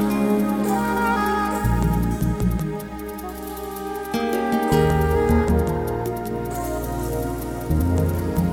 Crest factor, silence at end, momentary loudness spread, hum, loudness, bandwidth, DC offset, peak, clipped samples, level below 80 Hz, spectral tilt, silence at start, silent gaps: 16 dB; 0 s; 11 LU; none; -23 LUFS; 19.5 kHz; under 0.1%; -6 dBFS; under 0.1%; -30 dBFS; -7 dB/octave; 0 s; none